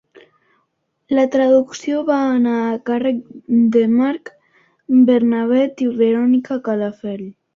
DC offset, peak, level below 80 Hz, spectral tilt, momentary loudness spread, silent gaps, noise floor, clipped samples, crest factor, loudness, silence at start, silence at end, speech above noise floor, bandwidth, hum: under 0.1%; -4 dBFS; -64 dBFS; -6.5 dB/octave; 9 LU; none; -69 dBFS; under 0.1%; 14 dB; -17 LUFS; 1.1 s; 0.25 s; 53 dB; 7.2 kHz; none